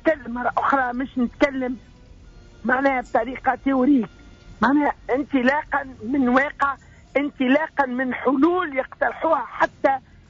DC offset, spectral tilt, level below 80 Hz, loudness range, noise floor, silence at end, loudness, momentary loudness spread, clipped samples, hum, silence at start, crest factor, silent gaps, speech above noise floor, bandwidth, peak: under 0.1%; -3.5 dB/octave; -50 dBFS; 2 LU; -46 dBFS; 0.3 s; -22 LUFS; 7 LU; under 0.1%; none; 0.05 s; 14 dB; none; 24 dB; 7.6 kHz; -8 dBFS